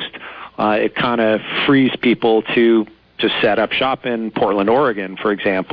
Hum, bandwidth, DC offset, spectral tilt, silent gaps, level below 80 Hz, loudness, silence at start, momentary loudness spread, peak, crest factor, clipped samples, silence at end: none; 5.2 kHz; under 0.1%; -8.5 dB/octave; none; -52 dBFS; -16 LUFS; 0 s; 7 LU; -4 dBFS; 12 dB; under 0.1%; 0 s